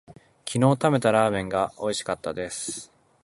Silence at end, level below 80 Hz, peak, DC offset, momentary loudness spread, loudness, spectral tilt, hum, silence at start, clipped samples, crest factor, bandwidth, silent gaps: 0.4 s; -56 dBFS; -6 dBFS; under 0.1%; 12 LU; -25 LUFS; -5 dB/octave; none; 0.1 s; under 0.1%; 20 dB; 11.5 kHz; none